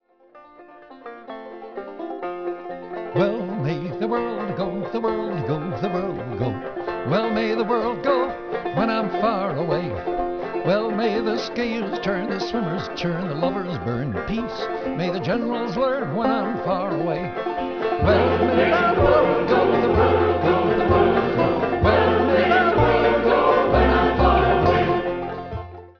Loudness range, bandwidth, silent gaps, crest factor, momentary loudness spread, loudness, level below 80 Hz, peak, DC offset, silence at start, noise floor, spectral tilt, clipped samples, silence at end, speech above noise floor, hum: 8 LU; 5.4 kHz; none; 18 dB; 12 LU; -21 LUFS; -38 dBFS; -4 dBFS; 0.3%; 0.35 s; -50 dBFS; -7.5 dB/octave; under 0.1%; 0.1 s; 27 dB; none